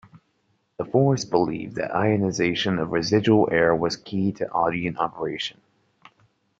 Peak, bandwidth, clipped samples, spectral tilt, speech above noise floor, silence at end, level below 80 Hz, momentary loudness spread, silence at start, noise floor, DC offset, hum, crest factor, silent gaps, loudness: -4 dBFS; 7.8 kHz; under 0.1%; -6 dB/octave; 47 dB; 1.1 s; -58 dBFS; 9 LU; 0.8 s; -69 dBFS; under 0.1%; none; 20 dB; none; -23 LUFS